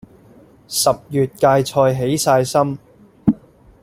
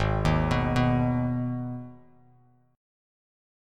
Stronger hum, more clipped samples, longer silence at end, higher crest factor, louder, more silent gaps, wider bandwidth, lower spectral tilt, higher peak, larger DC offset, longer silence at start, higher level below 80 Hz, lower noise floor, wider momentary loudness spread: neither; neither; second, 0.5 s vs 1.8 s; about the same, 16 dB vs 18 dB; first, -17 LUFS vs -26 LUFS; neither; first, 16.5 kHz vs 10.5 kHz; second, -5 dB/octave vs -7.5 dB/octave; first, -2 dBFS vs -10 dBFS; neither; first, 0.7 s vs 0 s; second, -50 dBFS vs -38 dBFS; second, -47 dBFS vs -61 dBFS; second, 8 LU vs 13 LU